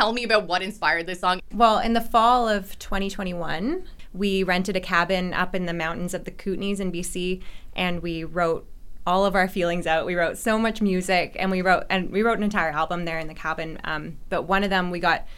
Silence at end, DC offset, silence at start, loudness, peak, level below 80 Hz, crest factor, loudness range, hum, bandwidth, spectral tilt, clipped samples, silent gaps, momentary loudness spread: 0 s; under 0.1%; 0 s; -24 LUFS; -4 dBFS; -40 dBFS; 20 dB; 4 LU; none; 16 kHz; -5 dB/octave; under 0.1%; none; 10 LU